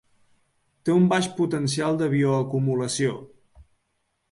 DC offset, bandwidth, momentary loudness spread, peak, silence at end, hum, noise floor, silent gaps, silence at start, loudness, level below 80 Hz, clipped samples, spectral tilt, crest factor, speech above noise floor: under 0.1%; 11.5 kHz; 7 LU; -8 dBFS; 0.7 s; none; -74 dBFS; none; 0.85 s; -23 LUFS; -62 dBFS; under 0.1%; -6 dB/octave; 16 dB; 51 dB